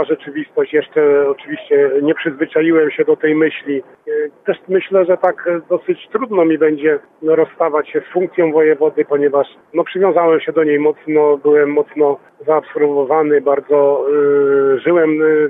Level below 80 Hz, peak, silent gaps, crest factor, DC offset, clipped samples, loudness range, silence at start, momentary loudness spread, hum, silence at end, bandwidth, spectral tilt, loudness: -68 dBFS; 0 dBFS; none; 14 dB; under 0.1%; under 0.1%; 2 LU; 0 s; 8 LU; none; 0 s; 3.8 kHz; -9.5 dB/octave; -15 LUFS